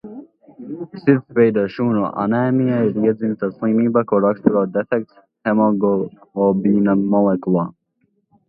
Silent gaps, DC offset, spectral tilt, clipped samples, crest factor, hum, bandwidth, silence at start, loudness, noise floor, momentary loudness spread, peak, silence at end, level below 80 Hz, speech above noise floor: none; under 0.1%; -12 dB/octave; under 0.1%; 18 dB; none; 5.2 kHz; 0.05 s; -18 LUFS; -66 dBFS; 10 LU; 0 dBFS; 0.8 s; -60 dBFS; 49 dB